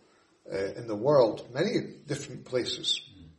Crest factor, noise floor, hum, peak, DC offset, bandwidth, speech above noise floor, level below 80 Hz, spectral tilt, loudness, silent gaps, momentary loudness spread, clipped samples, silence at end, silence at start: 20 dB; -56 dBFS; none; -10 dBFS; under 0.1%; 11.5 kHz; 27 dB; -66 dBFS; -4.5 dB/octave; -29 LUFS; none; 13 LU; under 0.1%; 0.1 s; 0.5 s